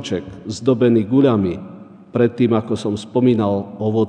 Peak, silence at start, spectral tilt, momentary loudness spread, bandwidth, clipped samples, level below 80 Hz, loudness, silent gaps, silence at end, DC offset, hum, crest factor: -2 dBFS; 0 s; -7.5 dB/octave; 11 LU; 9.6 kHz; under 0.1%; -54 dBFS; -18 LUFS; none; 0 s; under 0.1%; none; 16 dB